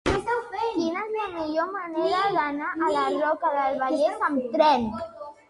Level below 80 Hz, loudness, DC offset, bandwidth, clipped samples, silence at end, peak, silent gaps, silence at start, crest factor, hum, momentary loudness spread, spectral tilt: -50 dBFS; -25 LUFS; under 0.1%; 11.5 kHz; under 0.1%; 0.15 s; -6 dBFS; none; 0.05 s; 18 dB; none; 8 LU; -5 dB/octave